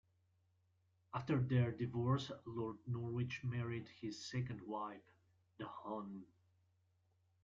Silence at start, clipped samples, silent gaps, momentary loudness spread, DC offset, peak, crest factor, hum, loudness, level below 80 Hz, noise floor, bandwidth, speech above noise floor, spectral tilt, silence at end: 1.15 s; under 0.1%; none; 13 LU; under 0.1%; -24 dBFS; 18 dB; none; -43 LUFS; -72 dBFS; -78 dBFS; 7.4 kHz; 37 dB; -6.5 dB/octave; 1.2 s